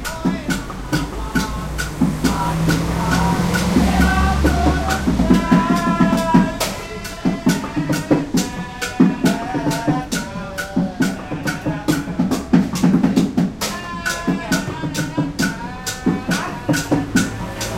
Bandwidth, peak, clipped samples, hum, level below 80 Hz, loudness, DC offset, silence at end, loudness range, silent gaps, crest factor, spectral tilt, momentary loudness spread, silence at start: 16.5 kHz; 0 dBFS; under 0.1%; none; -30 dBFS; -19 LUFS; under 0.1%; 0 s; 5 LU; none; 18 dB; -5.5 dB/octave; 9 LU; 0 s